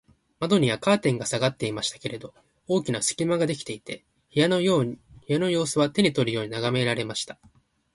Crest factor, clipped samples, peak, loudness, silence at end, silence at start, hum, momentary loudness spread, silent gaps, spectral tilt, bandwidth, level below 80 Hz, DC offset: 18 dB; under 0.1%; -8 dBFS; -25 LUFS; 0.6 s; 0.4 s; none; 13 LU; none; -4.5 dB/octave; 11.5 kHz; -60 dBFS; under 0.1%